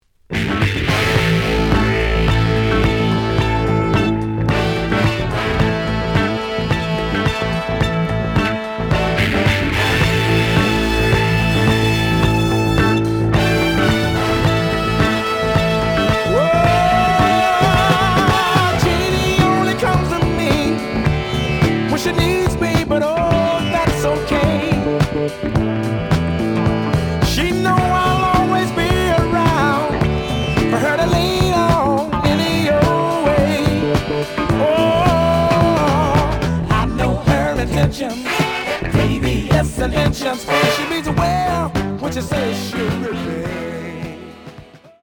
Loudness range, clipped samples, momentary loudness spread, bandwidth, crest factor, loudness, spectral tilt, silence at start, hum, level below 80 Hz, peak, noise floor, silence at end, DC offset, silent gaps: 4 LU; under 0.1%; 6 LU; 20 kHz; 16 dB; -16 LUFS; -6 dB/octave; 0.3 s; none; -28 dBFS; 0 dBFS; -41 dBFS; 0.25 s; under 0.1%; none